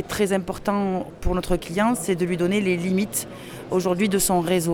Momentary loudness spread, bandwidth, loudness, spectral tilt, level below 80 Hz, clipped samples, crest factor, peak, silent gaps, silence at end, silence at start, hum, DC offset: 7 LU; over 20 kHz; -23 LUFS; -5 dB/octave; -38 dBFS; under 0.1%; 16 dB; -8 dBFS; none; 0 s; 0 s; none; under 0.1%